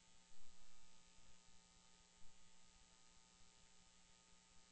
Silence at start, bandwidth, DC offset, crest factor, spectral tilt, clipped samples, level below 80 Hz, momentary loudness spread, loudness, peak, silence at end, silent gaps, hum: 0 s; 8.2 kHz; under 0.1%; 14 dB; -2 dB/octave; under 0.1%; -76 dBFS; 0 LU; -70 LUFS; -42 dBFS; 0 s; none; none